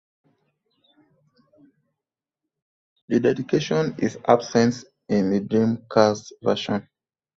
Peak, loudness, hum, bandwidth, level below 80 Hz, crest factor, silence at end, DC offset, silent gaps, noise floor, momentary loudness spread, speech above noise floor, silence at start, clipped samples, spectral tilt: -2 dBFS; -22 LUFS; none; 7.6 kHz; -62 dBFS; 22 dB; 0.55 s; under 0.1%; none; -87 dBFS; 6 LU; 66 dB; 3.1 s; under 0.1%; -6 dB/octave